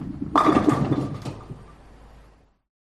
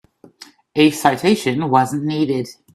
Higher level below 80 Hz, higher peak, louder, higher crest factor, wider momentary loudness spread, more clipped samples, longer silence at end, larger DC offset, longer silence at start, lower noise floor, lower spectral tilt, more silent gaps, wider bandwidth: first, -46 dBFS vs -58 dBFS; second, -4 dBFS vs 0 dBFS; second, -22 LUFS vs -17 LUFS; about the same, 22 dB vs 18 dB; first, 23 LU vs 7 LU; neither; first, 0.8 s vs 0.2 s; neither; second, 0 s vs 0.4 s; first, -55 dBFS vs -45 dBFS; first, -7.5 dB/octave vs -5.5 dB/octave; neither; second, 12.5 kHz vs 14.5 kHz